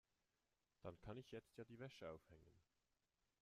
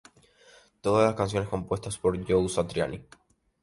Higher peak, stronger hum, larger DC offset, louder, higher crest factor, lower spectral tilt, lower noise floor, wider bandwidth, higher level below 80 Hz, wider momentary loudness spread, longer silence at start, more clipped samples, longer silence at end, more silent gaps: second, -40 dBFS vs -10 dBFS; neither; neither; second, -59 LUFS vs -27 LUFS; about the same, 20 dB vs 20 dB; about the same, -6.5 dB/octave vs -5.5 dB/octave; first, under -90 dBFS vs -58 dBFS; first, 13.5 kHz vs 11.5 kHz; second, -78 dBFS vs -50 dBFS; second, 5 LU vs 9 LU; about the same, 0.8 s vs 0.85 s; neither; first, 0.8 s vs 0.6 s; neither